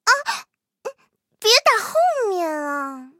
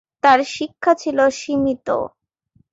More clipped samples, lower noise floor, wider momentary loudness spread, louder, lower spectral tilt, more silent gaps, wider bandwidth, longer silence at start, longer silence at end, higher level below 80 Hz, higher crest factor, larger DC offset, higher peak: neither; about the same, -64 dBFS vs -61 dBFS; first, 22 LU vs 9 LU; about the same, -19 LUFS vs -18 LUFS; second, 0.5 dB/octave vs -4 dB/octave; neither; first, 16.5 kHz vs 8 kHz; second, 0.05 s vs 0.25 s; second, 0.15 s vs 0.65 s; second, -84 dBFS vs -56 dBFS; about the same, 20 dB vs 18 dB; neither; about the same, 0 dBFS vs -2 dBFS